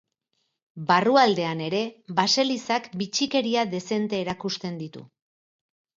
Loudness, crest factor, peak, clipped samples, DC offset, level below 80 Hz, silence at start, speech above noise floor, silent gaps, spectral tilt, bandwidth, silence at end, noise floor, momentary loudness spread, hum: -24 LUFS; 20 dB; -6 dBFS; under 0.1%; under 0.1%; -70 dBFS; 0.75 s; 52 dB; none; -4 dB/octave; 7.8 kHz; 0.9 s; -76 dBFS; 12 LU; none